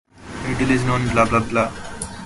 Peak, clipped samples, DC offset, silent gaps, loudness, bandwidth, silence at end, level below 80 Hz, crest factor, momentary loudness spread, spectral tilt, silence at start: -2 dBFS; under 0.1%; under 0.1%; none; -20 LUFS; 11.5 kHz; 0 s; -38 dBFS; 18 dB; 13 LU; -5.5 dB/octave; 0.15 s